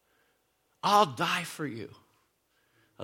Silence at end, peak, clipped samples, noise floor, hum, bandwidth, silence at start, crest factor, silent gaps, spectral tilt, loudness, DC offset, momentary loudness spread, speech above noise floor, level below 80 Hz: 0 s; -8 dBFS; under 0.1%; -73 dBFS; none; 17 kHz; 0.85 s; 24 dB; none; -3.5 dB/octave; -28 LUFS; under 0.1%; 18 LU; 45 dB; -76 dBFS